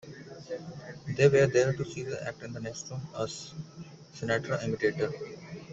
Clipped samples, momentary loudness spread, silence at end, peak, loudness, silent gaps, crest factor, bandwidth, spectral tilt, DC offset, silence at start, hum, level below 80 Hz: under 0.1%; 21 LU; 0 s; -10 dBFS; -30 LUFS; none; 22 dB; 8 kHz; -5.5 dB/octave; under 0.1%; 0.05 s; none; -62 dBFS